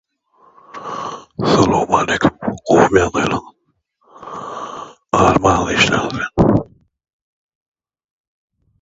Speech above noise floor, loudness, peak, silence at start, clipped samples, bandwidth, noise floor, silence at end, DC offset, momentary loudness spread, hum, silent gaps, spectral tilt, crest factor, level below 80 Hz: 51 dB; -15 LUFS; 0 dBFS; 0.75 s; under 0.1%; 8 kHz; -66 dBFS; 2.15 s; under 0.1%; 18 LU; none; none; -5 dB/octave; 18 dB; -38 dBFS